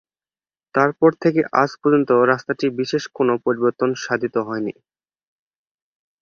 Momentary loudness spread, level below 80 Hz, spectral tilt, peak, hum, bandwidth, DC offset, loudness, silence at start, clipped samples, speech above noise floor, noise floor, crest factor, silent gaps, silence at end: 8 LU; -64 dBFS; -6 dB/octave; -2 dBFS; none; 7.2 kHz; under 0.1%; -19 LUFS; 0.75 s; under 0.1%; over 71 dB; under -90 dBFS; 18 dB; none; 1.5 s